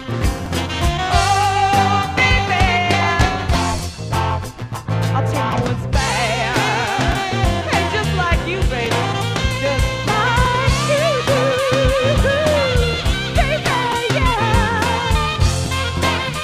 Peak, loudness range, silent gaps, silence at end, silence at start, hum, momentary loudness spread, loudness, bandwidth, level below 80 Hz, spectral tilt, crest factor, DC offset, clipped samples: -2 dBFS; 3 LU; none; 0 s; 0 s; none; 5 LU; -17 LUFS; 15.5 kHz; -26 dBFS; -4.5 dB/octave; 16 dB; under 0.1%; under 0.1%